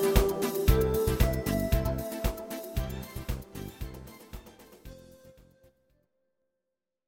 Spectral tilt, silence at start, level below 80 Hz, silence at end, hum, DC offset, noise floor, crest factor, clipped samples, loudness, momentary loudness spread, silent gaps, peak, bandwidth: -6 dB/octave; 0 s; -34 dBFS; 1.8 s; none; under 0.1%; -87 dBFS; 24 dB; under 0.1%; -30 LUFS; 22 LU; none; -8 dBFS; 17 kHz